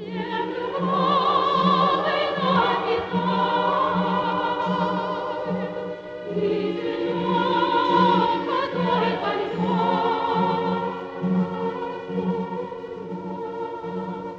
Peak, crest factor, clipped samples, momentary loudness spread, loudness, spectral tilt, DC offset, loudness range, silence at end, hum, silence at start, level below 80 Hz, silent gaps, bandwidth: -6 dBFS; 16 dB; under 0.1%; 11 LU; -23 LUFS; -7.5 dB/octave; under 0.1%; 5 LU; 0 s; none; 0 s; -60 dBFS; none; 7.2 kHz